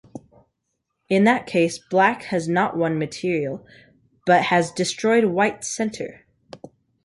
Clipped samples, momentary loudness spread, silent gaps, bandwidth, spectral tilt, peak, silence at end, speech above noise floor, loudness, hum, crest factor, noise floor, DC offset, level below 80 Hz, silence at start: under 0.1%; 10 LU; none; 11.5 kHz; -5 dB/octave; -4 dBFS; 0.5 s; 56 dB; -21 LUFS; none; 18 dB; -77 dBFS; under 0.1%; -62 dBFS; 0.15 s